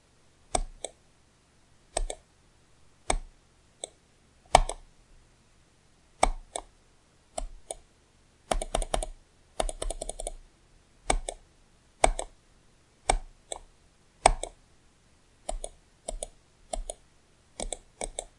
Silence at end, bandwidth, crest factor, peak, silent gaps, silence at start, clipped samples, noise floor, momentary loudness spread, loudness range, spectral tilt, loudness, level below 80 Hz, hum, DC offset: 0.1 s; 11.5 kHz; 34 dB; 0 dBFS; none; 0.55 s; under 0.1%; -63 dBFS; 17 LU; 8 LU; -2.5 dB/octave; -33 LUFS; -40 dBFS; none; under 0.1%